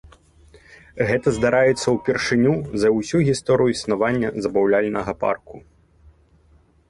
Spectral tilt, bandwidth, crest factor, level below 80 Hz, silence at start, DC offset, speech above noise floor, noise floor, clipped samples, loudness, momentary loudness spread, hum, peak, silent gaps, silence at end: -6 dB/octave; 11.5 kHz; 16 dB; -48 dBFS; 0.7 s; under 0.1%; 36 dB; -56 dBFS; under 0.1%; -20 LUFS; 6 LU; none; -6 dBFS; none; 1.3 s